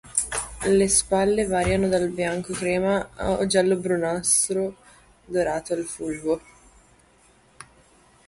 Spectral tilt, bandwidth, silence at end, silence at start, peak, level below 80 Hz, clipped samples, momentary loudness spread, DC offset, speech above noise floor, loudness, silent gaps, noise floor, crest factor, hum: -4 dB/octave; 12 kHz; 0.65 s; 0.05 s; -2 dBFS; -46 dBFS; under 0.1%; 9 LU; under 0.1%; 34 dB; -23 LUFS; none; -57 dBFS; 22 dB; none